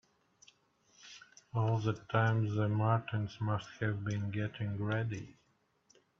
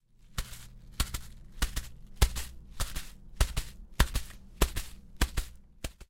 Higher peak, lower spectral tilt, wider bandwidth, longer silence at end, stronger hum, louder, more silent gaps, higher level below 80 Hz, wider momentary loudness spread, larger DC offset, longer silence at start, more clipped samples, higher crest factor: second, -14 dBFS vs -8 dBFS; first, -7.5 dB/octave vs -3.5 dB/octave; second, 6.8 kHz vs 17 kHz; first, 0.85 s vs 0.05 s; neither; about the same, -35 LUFS vs -35 LUFS; neither; second, -68 dBFS vs -36 dBFS; about the same, 18 LU vs 17 LU; neither; first, 1.05 s vs 0.3 s; neither; second, 20 dB vs 26 dB